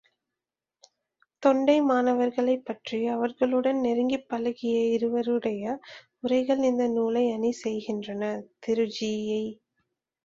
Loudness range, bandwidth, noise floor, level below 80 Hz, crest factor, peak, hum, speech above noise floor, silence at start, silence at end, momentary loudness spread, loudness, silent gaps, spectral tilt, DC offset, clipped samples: 3 LU; 7.6 kHz; -89 dBFS; -70 dBFS; 20 dB; -8 dBFS; none; 63 dB; 1.4 s; 0.7 s; 10 LU; -27 LUFS; none; -5.5 dB/octave; under 0.1%; under 0.1%